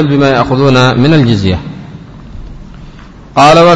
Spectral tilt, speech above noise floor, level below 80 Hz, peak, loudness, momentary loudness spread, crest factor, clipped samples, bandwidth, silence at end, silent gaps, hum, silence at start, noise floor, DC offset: -6.5 dB/octave; 25 dB; -32 dBFS; 0 dBFS; -8 LUFS; 24 LU; 8 dB; 2%; 11 kHz; 0 s; none; none; 0 s; -31 dBFS; under 0.1%